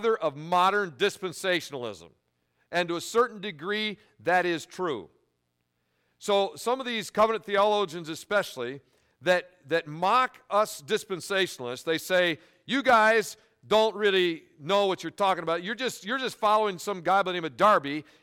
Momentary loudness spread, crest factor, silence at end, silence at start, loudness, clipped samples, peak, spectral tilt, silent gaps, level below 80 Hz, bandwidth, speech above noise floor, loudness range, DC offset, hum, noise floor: 11 LU; 18 dB; 0.2 s; 0 s; -27 LUFS; under 0.1%; -10 dBFS; -3.5 dB/octave; none; -70 dBFS; 17 kHz; 50 dB; 5 LU; under 0.1%; none; -77 dBFS